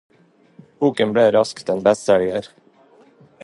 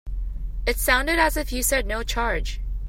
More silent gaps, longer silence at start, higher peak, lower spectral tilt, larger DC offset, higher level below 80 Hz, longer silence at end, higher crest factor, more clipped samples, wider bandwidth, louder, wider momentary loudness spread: neither; first, 0.8 s vs 0.05 s; first, -2 dBFS vs -6 dBFS; first, -5.5 dB/octave vs -3 dB/octave; neither; second, -60 dBFS vs -28 dBFS; first, 0.95 s vs 0 s; about the same, 18 dB vs 18 dB; neither; second, 11.5 kHz vs 16.5 kHz; first, -18 LUFS vs -23 LUFS; second, 7 LU vs 13 LU